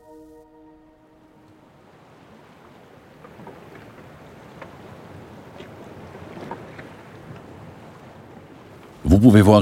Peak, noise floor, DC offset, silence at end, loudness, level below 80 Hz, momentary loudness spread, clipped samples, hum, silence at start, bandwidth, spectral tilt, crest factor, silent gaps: 0 dBFS; -52 dBFS; under 0.1%; 0 s; -14 LUFS; -40 dBFS; 29 LU; under 0.1%; none; 6.45 s; 15.5 kHz; -8 dB/octave; 22 dB; none